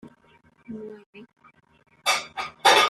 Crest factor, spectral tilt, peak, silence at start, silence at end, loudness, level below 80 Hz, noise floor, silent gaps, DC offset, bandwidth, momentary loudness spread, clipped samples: 22 dB; -0.5 dB/octave; -4 dBFS; 0.05 s; 0 s; -23 LUFS; -70 dBFS; -59 dBFS; 1.06-1.13 s; under 0.1%; 14 kHz; 21 LU; under 0.1%